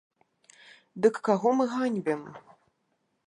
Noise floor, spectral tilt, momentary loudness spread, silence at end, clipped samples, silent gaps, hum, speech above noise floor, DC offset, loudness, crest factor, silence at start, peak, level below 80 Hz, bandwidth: -76 dBFS; -6.5 dB/octave; 16 LU; 0.85 s; under 0.1%; none; none; 49 dB; under 0.1%; -27 LUFS; 20 dB; 0.95 s; -8 dBFS; -82 dBFS; 10.5 kHz